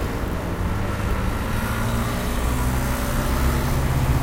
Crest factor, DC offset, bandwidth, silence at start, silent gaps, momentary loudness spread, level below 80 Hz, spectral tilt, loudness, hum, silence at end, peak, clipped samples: 14 dB; under 0.1%; 16 kHz; 0 s; none; 4 LU; -26 dBFS; -5.5 dB/octave; -24 LUFS; none; 0 s; -8 dBFS; under 0.1%